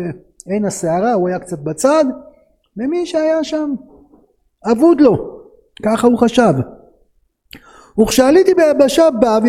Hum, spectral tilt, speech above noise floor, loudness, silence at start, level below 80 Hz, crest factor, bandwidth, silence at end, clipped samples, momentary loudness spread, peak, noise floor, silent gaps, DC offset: none; -5.5 dB/octave; 45 dB; -14 LUFS; 0 s; -46 dBFS; 14 dB; 16 kHz; 0 s; under 0.1%; 15 LU; 0 dBFS; -58 dBFS; none; under 0.1%